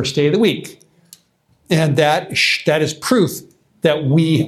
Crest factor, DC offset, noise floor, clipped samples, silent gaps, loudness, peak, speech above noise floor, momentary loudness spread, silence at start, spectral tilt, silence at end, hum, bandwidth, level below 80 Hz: 16 dB; under 0.1%; -59 dBFS; under 0.1%; none; -16 LUFS; 0 dBFS; 43 dB; 6 LU; 0 s; -5 dB/octave; 0 s; none; 14.5 kHz; -56 dBFS